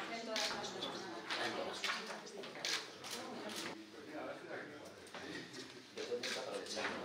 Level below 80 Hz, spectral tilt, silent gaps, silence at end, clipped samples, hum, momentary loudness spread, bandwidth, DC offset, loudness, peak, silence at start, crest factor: -86 dBFS; -2 dB/octave; none; 0 s; under 0.1%; none; 11 LU; 16 kHz; under 0.1%; -43 LUFS; -22 dBFS; 0 s; 22 dB